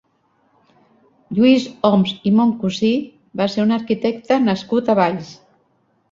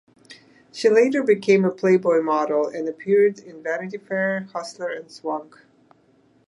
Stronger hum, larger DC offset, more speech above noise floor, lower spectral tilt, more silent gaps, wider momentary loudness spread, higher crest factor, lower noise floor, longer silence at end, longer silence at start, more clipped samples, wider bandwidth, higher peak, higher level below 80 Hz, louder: neither; neither; first, 46 dB vs 38 dB; about the same, -6.5 dB/octave vs -6 dB/octave; neither; second, 9 LU vs 13 LU; about the same, 16 dB vs 18 dB; about the same, -62 dBFS vs -59 dBFS; second, 0.8 s vs 1.05 s; first, 1.3 s vs 0.3 s; neither; second, 7.6 kHz vs 11 kHz; about the same, -2 dBFS vs -4 dBFS; first, -58 dBFS vs -76 dBFS; first, -18 LUFS vs -21 LUFS